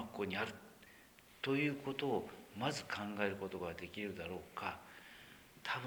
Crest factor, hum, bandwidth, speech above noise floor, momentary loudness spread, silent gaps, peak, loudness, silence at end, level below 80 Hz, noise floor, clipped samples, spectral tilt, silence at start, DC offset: 22 dB; none; over 20 kHz; 22 dB; 20 LU; none; -22 dBFS; -42 LUFS; 0 s; -72 dBFS; -63 dBFS; under 0.1%; -5 dB/octave; 0 s; under 0.1%